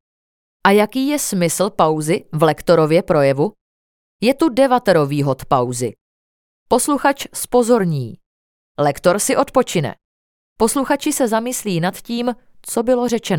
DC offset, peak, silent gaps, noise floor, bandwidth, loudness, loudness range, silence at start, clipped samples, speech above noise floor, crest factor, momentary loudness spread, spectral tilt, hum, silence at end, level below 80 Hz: under 0.1%; 0 dBFS; 3.61-4.19 s, 6.01-6.66 s, 8.26-8.75 s, 10.05-10.56 s; under -90 dBFS; 18.5 kHz; -17 LUFS; 3 LU; 0.65 s; under 0.1%; over 74 dB; 18 dB; 8 LU; -5 dB/octave; none; 0 s; -50 dBFS